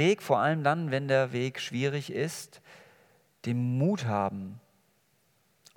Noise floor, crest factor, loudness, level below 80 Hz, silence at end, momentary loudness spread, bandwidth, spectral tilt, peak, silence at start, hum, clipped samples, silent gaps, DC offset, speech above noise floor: -70 dBFS; 20 dB; -29 LUFS; -80 dBFS; 1.15 s; 14 LU; 18 kHz; -6 dB/octave; -10 dBFS; 0 s; none; under 0.1%; none; under 0.1%; 41 dB